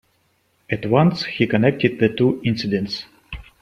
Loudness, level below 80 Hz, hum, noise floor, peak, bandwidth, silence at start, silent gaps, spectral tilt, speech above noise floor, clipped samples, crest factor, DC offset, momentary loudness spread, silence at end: -20 LUFS; -48 dBFS; none; -64 dBFS; -2 dBFS; 10.5 kHz; 0.7 s; none; -7.5 dB/octave; 45 dB; under 0.1%; 18 dB; under 0.1%; 14 LU; 0.2 s